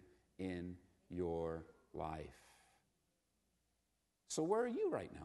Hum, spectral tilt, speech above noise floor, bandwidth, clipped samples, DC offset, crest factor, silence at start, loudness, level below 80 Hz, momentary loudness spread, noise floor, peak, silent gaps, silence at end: none; -5.5 dB/octave; 43 dB; 12 kHz; under 0.1%; under 0.1%; 22 dB; 0.4 s; -43 LUFS; -68 dBFS; 15 LU; -85 dBFS; -24 dBFS; none; 0 s